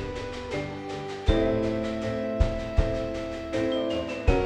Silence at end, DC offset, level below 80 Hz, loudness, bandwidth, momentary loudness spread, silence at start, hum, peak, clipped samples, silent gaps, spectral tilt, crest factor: 0 s; under 0.1%; -32 dBFS; -29 LUFS; 9.8 kHz; 9 LU; 0 s; none; -8 dBFS; under 0.1%; none; -7 dB/octave; 20 dB